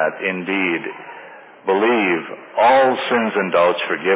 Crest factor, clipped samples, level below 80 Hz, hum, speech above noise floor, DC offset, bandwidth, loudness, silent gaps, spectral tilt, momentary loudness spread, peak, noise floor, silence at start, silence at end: 14 dB; under 0.1%; -68 dBFS; none; 22 dB; under 0.1%; 4 kHz; -18 LUFS; none; -8.5 dB/octave; 15 LU; -4 dBFS; -40 dBFS; 0 s; 0 s